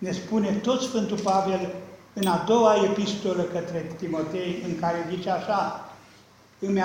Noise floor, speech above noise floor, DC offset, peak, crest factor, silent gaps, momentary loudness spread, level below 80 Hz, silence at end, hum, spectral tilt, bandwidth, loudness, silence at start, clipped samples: -54 dBFS; 29 dB; under 0.1%; -8 dBFS; 18 dB; none; 13 LU; -62 dBFS; 0 s; none; -5.5 dB/octave; 16 kHz; -26 LUFS; 0 s; under 0.1%